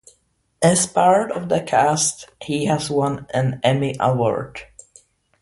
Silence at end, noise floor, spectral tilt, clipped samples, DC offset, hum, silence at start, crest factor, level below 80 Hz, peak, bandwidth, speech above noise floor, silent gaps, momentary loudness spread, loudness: 0.8 s; -65 dBFS; -4.5 dB/octave; under 0.1%; under 0.1%; none; 0.6 s; 18 dB; -54 dBFS; -2 dBFS; 11.5 kHz; 46 dB; none; 10 LU; -19 LUFS